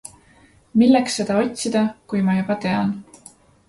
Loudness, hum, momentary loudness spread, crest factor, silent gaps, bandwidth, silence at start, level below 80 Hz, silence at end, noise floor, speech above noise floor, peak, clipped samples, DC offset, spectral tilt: -20 LUFS; none; 9 LU; 18 dB; none; 11.5 kHz; 0.75 s; -56 dBFS; 0.65 s; -53 dBFS; 34 dB; -4 dBFS; under 0.1%; under 0.1%; -5.5 dB/octave